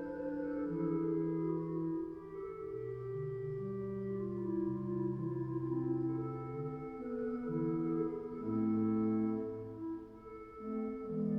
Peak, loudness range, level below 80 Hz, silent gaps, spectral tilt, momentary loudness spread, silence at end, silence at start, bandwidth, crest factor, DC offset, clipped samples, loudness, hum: -24 dBFS; 3 LU; -64 dBFS; none; -11.5 dB/octave; 9 LU; 0 s; 0 s; 3.1 kHz; 12 dB; under 0.1%; under 0.1%; -38 LUFS; none